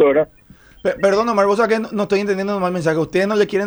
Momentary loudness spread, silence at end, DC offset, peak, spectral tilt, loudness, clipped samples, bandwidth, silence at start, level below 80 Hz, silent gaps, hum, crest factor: 5 LU; 0 s; under 0.1%; -2 dBFS; -6 dB/octave; -18 LUFS; under 0.1%; over 20 kHz; 0 s; -52 dBFS; none; none; 14 dB